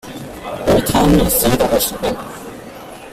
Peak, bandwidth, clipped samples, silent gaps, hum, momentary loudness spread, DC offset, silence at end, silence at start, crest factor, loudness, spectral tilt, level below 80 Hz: -2 dBFS; 16 kHz; under 0.1%; none; none; 20 LU; under 0.1%; 0 s; 0.05 s; 16 dB; -15 LUFS; -4.5 dB/octave; -30 dBFS